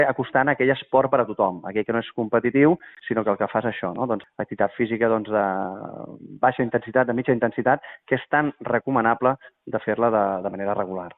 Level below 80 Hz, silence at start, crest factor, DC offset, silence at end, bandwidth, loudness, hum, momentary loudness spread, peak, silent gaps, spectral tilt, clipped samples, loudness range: -62 dBFS; 0 s; 18 dB; under 0.1%; 0.05 s; 4.1 kHz; -23 LUFS; none; 8 LU; -4 dBFS; none; -5 dB/octave; under 0.1%; 3 LU